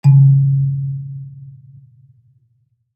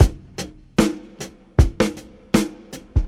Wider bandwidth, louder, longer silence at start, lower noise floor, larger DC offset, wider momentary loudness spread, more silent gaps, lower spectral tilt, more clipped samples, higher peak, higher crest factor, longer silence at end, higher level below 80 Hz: second, 2.6 kHz vs 16 kHz; first, -14 LUFS vs -22 LUFS; about the same, 0.05 s vs 0 s; first, -62 dBFS vs -38 dBFS; neither; first, 24 LU vs 17 LU; neither; first, -11 dB/octave vs -6 dB/octave; neither; about the same, -2 dBFS vs 0 dBFS; second, 14 dB vs 20 dB; first, 1.45 s vs 0 s; second, -64 dBFS vs -26 dBFS